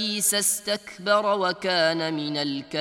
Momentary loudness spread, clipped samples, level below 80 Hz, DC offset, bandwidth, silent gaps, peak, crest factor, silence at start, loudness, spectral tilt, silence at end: 7 LU; under 0.1%; -72 dBFS; under 0.1%; 17 kHz; none; -8 dBFS; 16 dB; 0 s; -24 LUFS; -2 dB/octave; 0 s